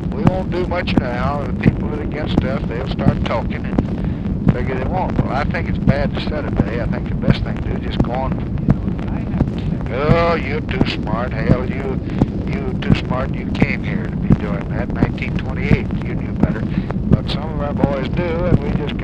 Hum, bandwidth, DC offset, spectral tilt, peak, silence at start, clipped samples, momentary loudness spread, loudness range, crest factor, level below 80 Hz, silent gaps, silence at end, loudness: none; 8 kHz; under 0.1%; -8.5 dB/octave; 0 dBFS; 0 s; under 0.1%; 5 LU; 1 LU; 18 dB; -26 dBFS; none; 0 s; -19 LUFS